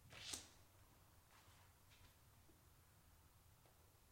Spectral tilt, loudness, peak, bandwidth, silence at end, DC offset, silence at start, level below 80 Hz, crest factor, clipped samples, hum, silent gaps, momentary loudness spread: -1.5 dB/octave; -54 LUFS; -28 dBFS; 16 kHz; 0 s; under 0.1%; 0 s; -78 dBFS; 34 dB; under 0.1%; none; none; 18 LU